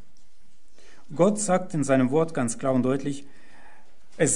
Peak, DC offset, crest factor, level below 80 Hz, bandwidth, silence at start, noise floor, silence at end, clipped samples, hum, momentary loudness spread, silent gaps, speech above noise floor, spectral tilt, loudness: -6 dBFS; 2%; 20 dB; -60 dBFS; 11 kHz; 1.1 s; -62 dBFS; 0 s; under 0.1%; none; 10 LU; none; 38 dB; -5.5 dB/octave; -24 LUFS